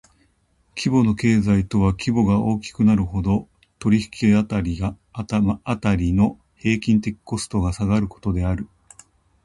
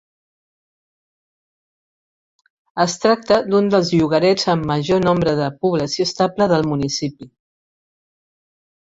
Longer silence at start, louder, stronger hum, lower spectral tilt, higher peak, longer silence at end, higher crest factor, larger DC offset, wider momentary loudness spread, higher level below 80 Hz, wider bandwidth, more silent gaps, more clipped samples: second, 0.75 s vs 2.75 s; second, -21 LUFS vs -17 LUFS; neither; first, -7 dB/octave vs -5.5 dB/octave; about the same, -4 dBFS vs -2 dBFS; second, 0.8 s vs 1.65 s; about the same, 16 dB vs 18 dB; neither; first, 9 LU vs 5 LU; first, -36 dBFS vs -52 dBFS; first, 11.5 kHz vs 8 kHz; neither; neither